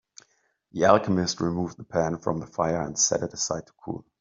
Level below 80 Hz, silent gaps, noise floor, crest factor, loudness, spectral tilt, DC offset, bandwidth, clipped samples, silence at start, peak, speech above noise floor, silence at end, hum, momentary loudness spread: -58 dBFS; none; -69 dBFS; 24 dB; -25 LUFS; -4 dB/octave; under 0.1%; 7.8 kHz; under 0.1%; 0.75 s; -4 dBFS; 43 dB; 0.2 s; none; 15 LU